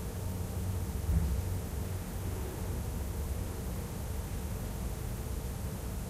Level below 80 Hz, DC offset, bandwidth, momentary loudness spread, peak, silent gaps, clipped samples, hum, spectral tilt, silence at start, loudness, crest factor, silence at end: -38 dBFS; under 0.1%; 16 kHz; 6 LU; -18 dBFS; none; under 0.1%; none; -6 dB/octave; 0 s; -37 LUFS; 16 dB; 0 s